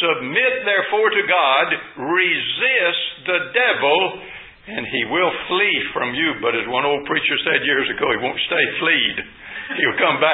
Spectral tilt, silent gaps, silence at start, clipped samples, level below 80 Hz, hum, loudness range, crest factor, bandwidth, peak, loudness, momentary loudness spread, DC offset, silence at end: -8.5 dB/octave; none; 0 s; under 0.1%; -58 dBFS; none; 2 LU; 18 dB; 4 kHz; 0 dBFS; -18 LUFS; 8 LU; under 0.1%; 0 s